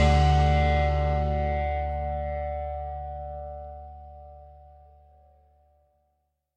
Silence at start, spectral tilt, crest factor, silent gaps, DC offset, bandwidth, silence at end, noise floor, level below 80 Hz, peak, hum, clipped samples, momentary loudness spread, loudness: 0 s; -7 dB/octave; 18 dB; none; under 0.1%; 8 kHz; 1.95 s; -75 dBFS; -30 dBFS; -10 dBFS; none; under 0.1%; 23 LU; -27 LUFS